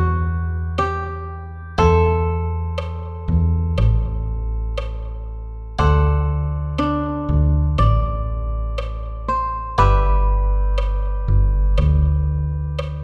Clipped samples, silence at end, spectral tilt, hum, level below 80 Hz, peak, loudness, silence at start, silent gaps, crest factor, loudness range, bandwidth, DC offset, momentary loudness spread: under 0.1%; 0 s; -8.5 dB/octave; none; -20 dBFS; -2 dBFS; -20 LUFS; 0 s; none; 16 dB; 3 LU; 6.6 kHz; under 0.1%; 11 LU